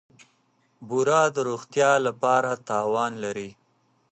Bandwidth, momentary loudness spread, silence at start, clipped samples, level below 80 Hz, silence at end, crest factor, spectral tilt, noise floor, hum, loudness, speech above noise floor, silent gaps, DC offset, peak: 8.8 kHz; 11 LU; 0.8 s; under 0.1%; -72 dBFS; 0.6 s; 20 dB; -4 dB/octave; -67 dBFS; none; -24 LUFS; 43 dB; none; under 0.1%; -6 dBFS